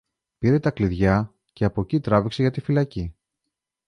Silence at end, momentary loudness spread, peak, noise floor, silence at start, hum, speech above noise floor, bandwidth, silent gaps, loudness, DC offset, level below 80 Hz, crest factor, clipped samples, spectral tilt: 0.75 s; 8 LU; -6 dBFS; -82 dBFS; 0.4 s; none; 61 dB; 10.5 kHz; none; -23 LUFS; under 0.1%; -42 dBFS; 18 dB; under 0.1%; -8.5 dB/octave